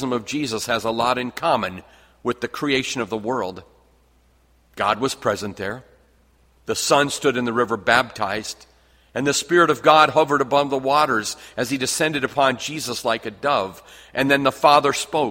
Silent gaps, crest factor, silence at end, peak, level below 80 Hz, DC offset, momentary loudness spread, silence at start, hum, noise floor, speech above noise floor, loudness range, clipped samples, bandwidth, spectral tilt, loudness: none; 22 dB; 0 s; 0 dBFS; -56 dBFS; under 0.1%; 13 LU; 0 s; none; -58 dBFS; 37 dB; 8 LU; under 0.1%; 16.5 kHz; -3.5 dB/octave; -20 LUFS